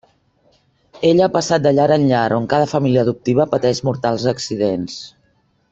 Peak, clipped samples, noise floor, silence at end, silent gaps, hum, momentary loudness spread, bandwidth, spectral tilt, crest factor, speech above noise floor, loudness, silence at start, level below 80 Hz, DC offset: -2 dBFS; under 0.1%; -61 dBFS; 0.6 s; none; none; 6 LU; 8.2 kHz; -6 dB/octave; 16 dB; 45 dB; -17 LUFS; 0.95 s; -54 dBFS; under 0.1%